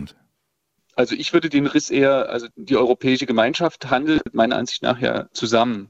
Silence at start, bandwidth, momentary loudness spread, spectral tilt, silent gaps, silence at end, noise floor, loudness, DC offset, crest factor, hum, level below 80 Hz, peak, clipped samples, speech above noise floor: 0 s; 8.2 kHz; 6 LU; -4.5 dB/octave; none; 0.05 s; -74 dBFS; -20 LUFS; under 0.1%; 18 dB; none; -54 dBFS; -2 dBFS; under 0.1%; 55 dB